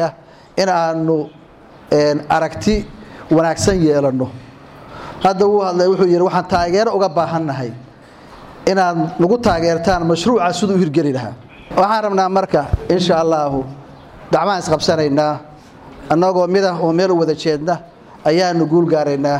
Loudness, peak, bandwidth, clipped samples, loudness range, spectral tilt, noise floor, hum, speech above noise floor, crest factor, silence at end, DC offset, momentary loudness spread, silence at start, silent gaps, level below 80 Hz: -16 LUFS; -4 dBFS; 13 kHz; under 0.1%; 2 LU; -6 dB/octave; -42 dBFS; none; 27 dB; 12 dB; 0 s; under 0.1%; 10 LU; 0 s; none; -38 dBFS